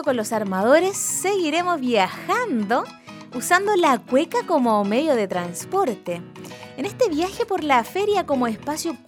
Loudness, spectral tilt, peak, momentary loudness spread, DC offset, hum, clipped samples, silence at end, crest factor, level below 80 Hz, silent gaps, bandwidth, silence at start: -21 LUFS; -3.5 dB/octave; -4 dBFS; 13 LU; under 0.1%; none; under 0.1%; 0.1 s; 18 dB; -60 dBFS; none; 19 kHz; 0 s